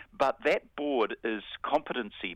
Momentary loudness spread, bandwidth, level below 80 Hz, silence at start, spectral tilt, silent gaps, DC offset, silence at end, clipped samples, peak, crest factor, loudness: 7 LU; 12.5 kHz; -64 dBFS; 0 s; -5 dB/octave; none; under 0.1%; 0 s; under 0.1%; -12 dBFS; 18 dB; -31 LUFS